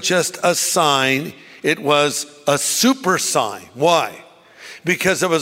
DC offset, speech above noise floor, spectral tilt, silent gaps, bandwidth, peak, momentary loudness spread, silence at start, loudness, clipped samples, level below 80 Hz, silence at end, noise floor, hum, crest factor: under 0.1%; 23 dB; -2.5 dB/octave; none; 16.5 kHz; -2 dBFS; 9 LU; 0 s; -17 LUFS; under 0.1%; -62 dBFS; 0 s; -41 dBFS; none; 18 dB